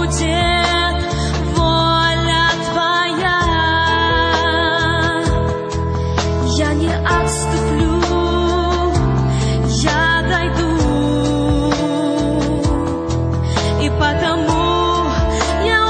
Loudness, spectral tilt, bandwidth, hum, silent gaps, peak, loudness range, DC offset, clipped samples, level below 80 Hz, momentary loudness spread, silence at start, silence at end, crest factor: -16 LUFS; -5 dB/octave; 11 kHz; none; none; -2 dBFS; 2 LU; under 0.1%; under 0.1%; -24 dBFS; 4 LU; 0 s; 0 s; 14 dB